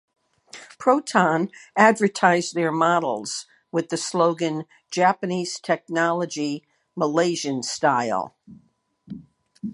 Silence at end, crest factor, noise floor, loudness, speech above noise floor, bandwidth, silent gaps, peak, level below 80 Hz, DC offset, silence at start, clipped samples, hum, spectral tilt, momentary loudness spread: 0 s; 22 dB; -46 dBFS; -22 LUFS; 24 dB; 11.5 kHz; none; 0 dBFS; -72 dBFS; under 0.1%; 0.55 s; under 0.1%; none; -4.5 dB/octave; 17 LU